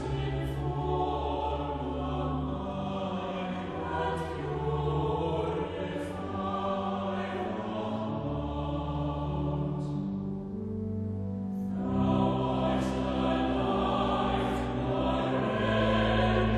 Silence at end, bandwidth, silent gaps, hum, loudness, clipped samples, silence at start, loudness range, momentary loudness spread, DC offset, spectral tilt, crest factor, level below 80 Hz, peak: 0 s; 11.5 kHz; none; none; -31 LUFS; under 0.1%; 0 s; 5 LU; 7 LU; under 0.1%; -7.5 dB/octave; 16 dB; -42 dBFS; -14 dBFS